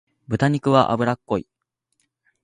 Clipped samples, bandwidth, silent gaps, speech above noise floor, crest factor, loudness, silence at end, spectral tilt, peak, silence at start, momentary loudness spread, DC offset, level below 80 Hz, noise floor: under 0.1%; 10.5 kHz; none; 53 dB; 22 dB; -21 LUFS; 1.05 s; -7 dB/octave; -2 dBFS; 0.3 s; 10 LU; under 0.1%; -54 dBFS; -73 dBFS